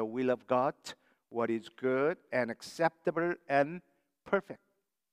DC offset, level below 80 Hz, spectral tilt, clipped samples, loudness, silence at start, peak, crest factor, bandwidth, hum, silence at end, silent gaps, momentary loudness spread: under 0.1%; -82 dBFS; -6 dB/octave; under 0.1%; -33 LUFS; 0 s; -12 dBFS; 20 dB; 15 kHz; none; 0.55 s; none; 15 LU